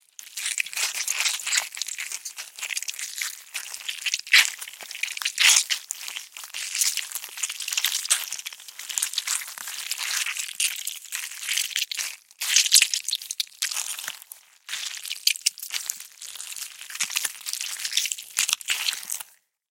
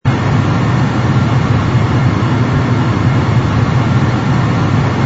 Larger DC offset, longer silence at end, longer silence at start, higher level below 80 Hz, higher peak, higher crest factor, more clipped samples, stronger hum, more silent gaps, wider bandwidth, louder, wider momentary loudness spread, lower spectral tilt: neither; first, 0.45 s vs 0 s; first, 0.2 s vs 0.05 s; second, -88 dBFS vs -30 dBFS; about the same, -2 dBFS vs 0 dBFS; first, 26 dB vs 12 dB; neither; neither; neither; first, 17 kHz vs 8 kHz; second, -24 LUFS vs -13 LUFS; first, 17 LU vs 1 LU; second, 6 dB/octave vs -7.5 dB/octave